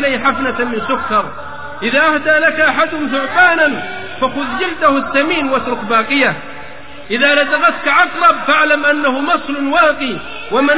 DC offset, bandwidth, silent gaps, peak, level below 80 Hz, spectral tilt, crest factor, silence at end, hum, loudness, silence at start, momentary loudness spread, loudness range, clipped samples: 3%; 4 kHz; none; 0 dBFS; -46 dBFS; -7.5 dB/octave; 14 dB; 0 s; none; -13 LUFS; 0 s; 12 LU; 2 LU; under 0.1%